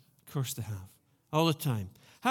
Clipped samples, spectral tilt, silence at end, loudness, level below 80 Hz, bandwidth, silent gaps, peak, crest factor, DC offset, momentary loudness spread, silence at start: under 0.1%; -5.5 dB/octave; 0 s; -33 LUFS; -70 dBFS; 19 kHz; none; -12 dBFS; 20 dB; under 0.1%; 13 LU; 0.25 s